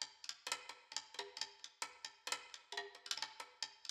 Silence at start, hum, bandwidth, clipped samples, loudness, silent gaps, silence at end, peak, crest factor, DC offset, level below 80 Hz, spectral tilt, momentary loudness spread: 0 s; none; over 20 kHz; under 0.1%; -47 LUFS; none; 0 s; -22 dBFS; 26 dB; under 0.1%; under -90 dBFS; 2 dB/octave; 5 LU